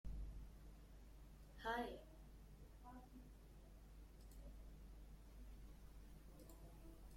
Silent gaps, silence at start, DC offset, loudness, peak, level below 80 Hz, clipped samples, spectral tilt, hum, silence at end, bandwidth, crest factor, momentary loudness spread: none; 0.05 s; under 0.1%; -58 LUFS; -32 dBFS; -60 dBFS; under 0.1%; -5.5 dB/octave; 50 Hz at -60 dBFS; 0 s; 16.5 kHz; 24 dB; 15 LU